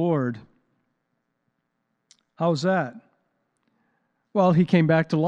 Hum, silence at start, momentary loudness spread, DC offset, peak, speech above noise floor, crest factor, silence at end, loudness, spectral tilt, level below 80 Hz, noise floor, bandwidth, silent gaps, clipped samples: none; 0 s; 12 LU; under 0.1%; -6 dBFS; 55 dB; 18 dB; 0 s; -22 LUFS; -8 dB/octave; -70 dBFS; -76 dBFS; 8 kHz; none; under 0.1%